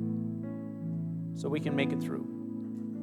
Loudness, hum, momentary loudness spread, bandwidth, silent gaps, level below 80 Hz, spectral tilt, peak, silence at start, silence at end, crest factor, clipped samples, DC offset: -35 LUFS; none; 8 LU; 13 kHz; none; -80 dBFS; -7.5 dB/octave; -16 dBFS; 0 s; 0 s; 18 dB; under 0.1%; under 0.1%